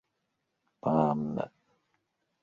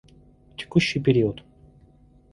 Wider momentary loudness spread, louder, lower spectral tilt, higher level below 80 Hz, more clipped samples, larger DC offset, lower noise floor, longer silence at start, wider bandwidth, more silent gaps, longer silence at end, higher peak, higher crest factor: second, 11 LU vs 20 LU; second, -30 LUFS vs -22 LUFS; first, -10 dB/octave vs -6.5 dB/octave; second, -68 dBFS vs -52 dBFS; neither; neither; first, -81 dBFS vs -55 dBFS; first, 0.85 s vs 0.6 s; second, 7 kHz vs 11.5 kHz; neither; about the same, 0.95 s vs 0.95 s; second, -10 dBFS vs -4 dBFS; about the same, 24 dB vs 22 dB